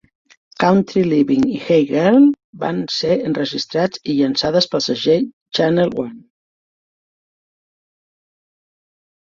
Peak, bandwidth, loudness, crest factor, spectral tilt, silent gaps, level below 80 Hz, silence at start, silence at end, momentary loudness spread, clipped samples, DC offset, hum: -2 dBFS; 7.6 kHz; -17 LUFS; 16 dB; -6 dB/octave; 2.44-2.53 s, 5.33-5.46 s; -56 dBFS; 0.6 s; 3.05 s; 8 LU; under 0.1%; under 0.1%; none